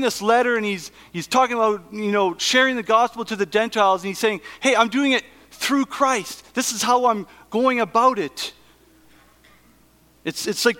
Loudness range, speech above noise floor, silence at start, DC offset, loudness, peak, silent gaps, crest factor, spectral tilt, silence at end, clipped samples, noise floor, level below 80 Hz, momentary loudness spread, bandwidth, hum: 3 LU; 35 dB; 0 s; under 0.1%; -20 LUFS; -2 dBFS; none; 20 dB; -3 dB/octave; 0 s; under 0.1%; -56 dBFS; -62 dBFS; 10 LU; 17.5 kHz; none